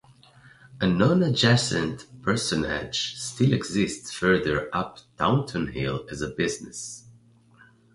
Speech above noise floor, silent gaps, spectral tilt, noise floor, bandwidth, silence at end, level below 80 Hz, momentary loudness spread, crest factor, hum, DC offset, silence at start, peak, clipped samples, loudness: 31 dB; none; -5 dB/octave; -56 dBFS; 11.5 kHz; 0.85 s; -50 dBFS; 12 LU; 20 dB; none; under 0.1%; 0.75 s; -6 dBFS; under 0.1%; -25 LUFS